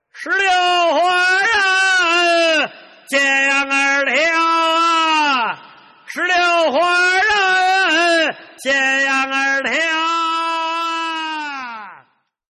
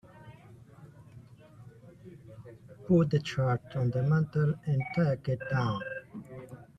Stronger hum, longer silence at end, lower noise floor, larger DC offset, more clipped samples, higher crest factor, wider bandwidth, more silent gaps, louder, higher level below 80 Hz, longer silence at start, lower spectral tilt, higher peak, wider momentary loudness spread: neither; first, 0.55 s vs 0.15 s; about the same, -56 dBFS vs -53 dBFS; neither; neither; second, 10 dB vs 18 dB; first, 13 kHz vs 7.8 kHz; neither; first, -15 LUFS vs -30 LUFS; about the same, -62 dBFS vs -60 dBFS; about the same, 0.15 s vs 0.15 s; second, -0.5 dB/octave vs -8.5 dB/octave; first, -6 dBFS vs -14 dBFS; second, 9 LU vs 24 LU